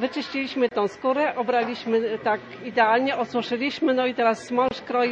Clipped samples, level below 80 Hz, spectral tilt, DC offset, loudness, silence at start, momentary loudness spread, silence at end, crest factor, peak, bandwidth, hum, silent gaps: under 0.1%; -66 dBFS; -5 dB/octave; under 0.1%; -24 LUFS; 0 s; 6 LU; 0 s; 18 dB; -6 dBFS; 9.2 kHz; none; none